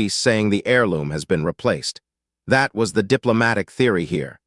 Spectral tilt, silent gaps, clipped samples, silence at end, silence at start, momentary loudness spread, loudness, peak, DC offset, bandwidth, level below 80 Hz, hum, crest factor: -5 dB/octave; none; under 0.1%; 0.15 s; 0 s; 6 LU; -20 LUFS; -2 dBFS; under 0.1%; 12 kHz; -52 dBFS; none; 18 dB